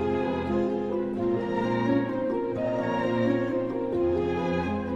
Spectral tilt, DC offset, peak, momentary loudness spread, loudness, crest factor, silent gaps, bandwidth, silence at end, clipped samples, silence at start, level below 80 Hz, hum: -8 dB/octave; under 0.1%; -14 dBFS; 3 LU; -27 LUFS; 12 dB; none; 7.4 kHz; 0 s; under 0.1%; 0 s; -50 dBFS; none